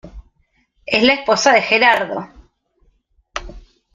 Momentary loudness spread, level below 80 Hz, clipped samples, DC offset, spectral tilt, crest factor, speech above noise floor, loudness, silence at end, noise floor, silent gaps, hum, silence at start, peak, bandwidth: 19 LU; -44 dBFS; under 0.1%; under 0.1%; -2.5 dB/octave; 18 dB; 48 dB; -14 LUFS; 0.35 s; -62 dBFS; none; none; 0.05 s; 0 dBFS; 15 kHz